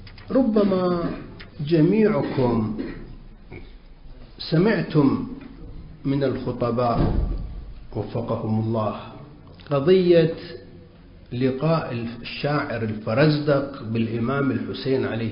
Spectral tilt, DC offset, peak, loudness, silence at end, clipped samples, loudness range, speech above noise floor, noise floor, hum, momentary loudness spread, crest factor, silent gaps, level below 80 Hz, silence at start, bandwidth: -12 dB/octave; under 0.1%; -6 dBFS; -23 LUFS; 0 s; under 0.1%; 3 LU; 25 dB; -46 dBFS; none; 20 LU; 16 dB; none; -38 dBFS; 0 s; 5.4 kHz